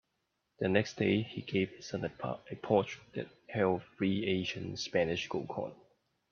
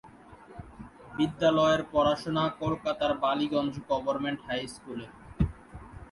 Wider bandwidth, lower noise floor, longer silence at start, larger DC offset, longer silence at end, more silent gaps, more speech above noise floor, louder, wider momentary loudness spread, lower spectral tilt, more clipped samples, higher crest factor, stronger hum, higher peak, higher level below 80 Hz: second, 7 kHz vs 11.5 kHz; first, -82 dBFS vs -51 dBFS; first, 0.6 s vs 0.05 s; neither; first, 0.55 s vs 0.05 s; neither; first, 48 dB vs 23 dB; second, -34 LUFS vs -29 LUFS; second, 10 LU vs 23 LU; about the same, -6 dB/octave vs -6 dB/octave; neither; about the same, 22 dB vs 18 dB; neither; about the same, -14 dBFS vs -12 dBFS; second, -68 dBFS vs -48 dBFS